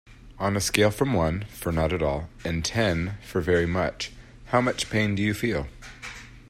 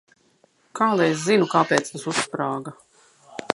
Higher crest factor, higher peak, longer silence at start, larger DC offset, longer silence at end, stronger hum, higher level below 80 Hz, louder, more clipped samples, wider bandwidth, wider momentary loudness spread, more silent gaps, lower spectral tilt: about the same, 24 dB vs 24 dB; about the same, -2 dBFS vs 0 dBFS; second, 0.05 s vs 0.75 s; neither; about the same, 0 s vs 0 s; neither; first, -44 dBFS vs -72 dBFS; second, -26 LUFS vs -22 LUFS; neither; first, 16 kHz vs 11.5 kHz; second, 13 LU vs 20 LU; neither; about the same, -5 dB/octave vs -4.5 dB/octave